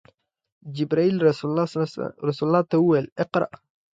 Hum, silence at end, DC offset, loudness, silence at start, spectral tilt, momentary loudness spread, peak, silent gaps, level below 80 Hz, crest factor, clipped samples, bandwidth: none; 0.5 s; under 0.1%; -23 LUFS; 0.65 s; -8 dB/octave; 9 LU; -6 dBFS; 3.12-3.16 s; -66 dBFS; 18 dB; under 0.1%; 7.8 kHz